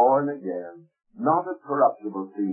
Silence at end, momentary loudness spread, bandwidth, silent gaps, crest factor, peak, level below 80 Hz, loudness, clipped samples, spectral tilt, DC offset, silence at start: 0 s; 11 LU; 2.6 kHz; none; 16 dB; -8 dBFS; -80 dBFS; -25 LUFS; under 0.1%; -14 dB/octave; under 0.1%; 0 s